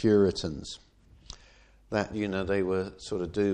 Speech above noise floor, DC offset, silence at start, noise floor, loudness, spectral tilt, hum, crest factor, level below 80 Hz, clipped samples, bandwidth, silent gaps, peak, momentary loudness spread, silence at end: 30 dB; under 0.1%; 0 s; -57 dBFS; -30 LUFS; -6 dB/octave; none; 18 dB; -52 dBFS; under 0.1%; 9.8 kHz; none; -12 dBFS; 23 LU; 0 s